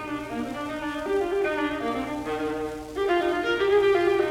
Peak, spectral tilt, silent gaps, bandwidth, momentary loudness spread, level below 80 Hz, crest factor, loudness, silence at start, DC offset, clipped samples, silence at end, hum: -10 dBFS; -5 dB/octave; none; 15 kHz; 10 LU; -50 dBFS; 14 dB; -26 LUFS; 0 s; under 0.1%; under 0.1%; 0 s; none